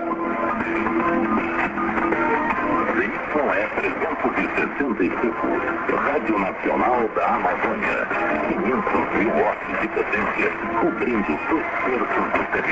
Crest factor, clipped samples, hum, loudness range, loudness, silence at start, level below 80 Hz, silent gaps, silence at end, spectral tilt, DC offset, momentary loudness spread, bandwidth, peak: 16 dB; under 0.1%; none; 1 LU; -22 LUFS; 0 s; -48 dBFS; none; 0 s; -7 dB/octave; under 0.1%; 3 LU; 7.8 kHz; -6 dBFS